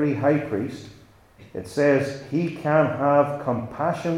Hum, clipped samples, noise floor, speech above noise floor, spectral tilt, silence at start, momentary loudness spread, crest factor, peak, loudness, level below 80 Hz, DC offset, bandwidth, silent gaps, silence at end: none; under 0.1%; -50 dBFS; 28 dB; -7.5 dB/octave; 0 s; 13 LU; 18 dB; -6 dBFS; -23 LUFS; -60 dBFS; under 0.1%; 13 kHz; none; 0 s